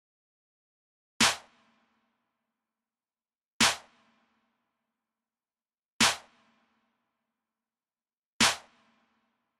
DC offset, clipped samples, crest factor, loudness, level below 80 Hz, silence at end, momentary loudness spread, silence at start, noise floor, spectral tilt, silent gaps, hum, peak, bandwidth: under 0.1%; under 0.1%; 26 dB; -25 LUFS; -64 dBFS; 1 s; 14 LU; 1.2 s; under -90 dBFS; -0.5 dB/octave; 3.52-3.60 s, 5.92-6.00 s, 8.18-8.40 s; none; -10 dBFS; 15.5 kHz